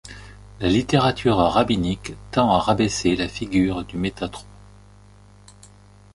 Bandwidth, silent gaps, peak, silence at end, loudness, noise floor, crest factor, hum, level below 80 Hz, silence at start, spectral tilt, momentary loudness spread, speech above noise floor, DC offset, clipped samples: 11.5 kHz; none; -2 dBFS; 1.7 s; -21 LUFS; -49 dBFS; 20 dB; 50 Hz at -40 dBFS; -42 dBFS; 0.05 s; -5.5 dB/octave; 13 LU; 28 dB; under 0.1%; under 0.1%